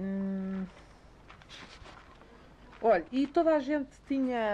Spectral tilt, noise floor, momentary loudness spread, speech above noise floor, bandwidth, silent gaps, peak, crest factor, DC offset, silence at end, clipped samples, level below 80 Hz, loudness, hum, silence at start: -7.5 dB/octave; -55 dBFS; 22 LU; 26 dB; 9.2 kHz; none; -16 dBFS; 18 dB; under 0.1%; 0 s; under 0.1%; -60 dBFS; -30 LUFS; none; 0 s